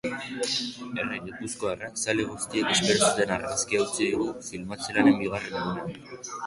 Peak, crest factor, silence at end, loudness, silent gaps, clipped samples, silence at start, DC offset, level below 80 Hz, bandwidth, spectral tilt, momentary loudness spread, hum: -8 dBFS; 20 dB; 0 s; -27 LUFS; none; under 0.1%; 0.05 s; under 0.1%; -58 dBFS; 11.5 kHz; -3 dB/octave; 13 LU; none